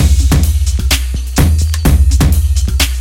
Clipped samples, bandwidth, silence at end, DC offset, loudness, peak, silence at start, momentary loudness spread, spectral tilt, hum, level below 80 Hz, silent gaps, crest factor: under 0.1%; 16.5 kHz; 0 s; under 0.1%; -12 LUFS; 0 dBFS; 0 s; 4 LU; -4.5 dB/octave; none; -12 dBFS; none; 10 dB